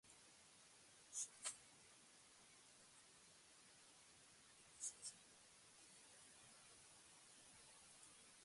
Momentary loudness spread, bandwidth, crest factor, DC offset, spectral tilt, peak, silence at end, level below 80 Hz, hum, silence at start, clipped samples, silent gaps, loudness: 15 LU; 11.5 kHz; 28 dB; under 0.1%; 0.5 dB/octave; -34 dBFS; 0 s; under -90 dBFS; none; 0.05 s; under 0.1%; none; -59 LUFS